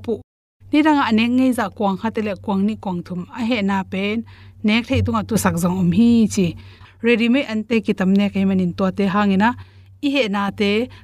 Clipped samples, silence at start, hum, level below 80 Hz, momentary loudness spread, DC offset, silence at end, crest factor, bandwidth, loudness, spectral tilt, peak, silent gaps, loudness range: under 0.1%; 0 s; none; -50 dBFS; 10 LU; under 0.1%; 0.05 s; 16 dB; 14.5 kHz; -19 LUFS; -6 dB/octave; -4 dBFS; 0.24-0.60 s; 4 LU